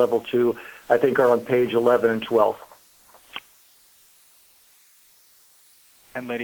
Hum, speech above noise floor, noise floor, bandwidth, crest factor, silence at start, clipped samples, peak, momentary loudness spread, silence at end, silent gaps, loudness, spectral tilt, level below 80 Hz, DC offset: none; 35 dB; -56 dBFS; over 20 kHz; 20 dB; 0 s; under 0.1%; -4 dBFS; 20 LU; 0 s; none; -21 LUFS; -6 dB/octave; -66 dBFS; under 0.1%